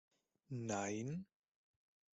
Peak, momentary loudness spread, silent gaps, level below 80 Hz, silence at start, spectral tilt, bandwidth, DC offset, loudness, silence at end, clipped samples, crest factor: -28 dBFS; 9 LU; none; -80 dBFS; 0.5 s; -5.5 dB/octave; 8.2 kHz; under 0.1%; -44 LUFS; 0.9 s; under 0.1%; 18 dB